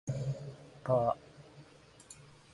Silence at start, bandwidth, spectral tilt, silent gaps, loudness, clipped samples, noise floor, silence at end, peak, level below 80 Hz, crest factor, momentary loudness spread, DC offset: 0.05 s; 11.5 kHz; -7.5 dB/octave; none; -35 LUFS; under 0.1%; -58 dBFS; 0.3 s; -16 dBFS; -64 dBFS; 22 dB; 25 LU; under 0.1%